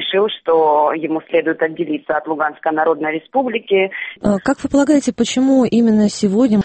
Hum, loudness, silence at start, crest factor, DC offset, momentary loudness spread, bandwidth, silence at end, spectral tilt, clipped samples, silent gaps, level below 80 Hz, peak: none; -16 LUFS; 0 s; 14 dB; under 0.1%; 7 LU; 8.8 kHz; 0 s; -5.5 dB/octave; under 0.1%; none; -48 dBFS; -2 dBFS